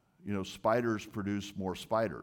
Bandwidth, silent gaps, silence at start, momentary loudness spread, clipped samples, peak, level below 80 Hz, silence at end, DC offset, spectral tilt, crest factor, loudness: 18 kHz; none; 0.25 s; 8 LU; under 0.1%; -16 dBFS; -66 dBFS; 0 s; under 0.1%; -6 dB/octave; 18 dB; -34 LUFS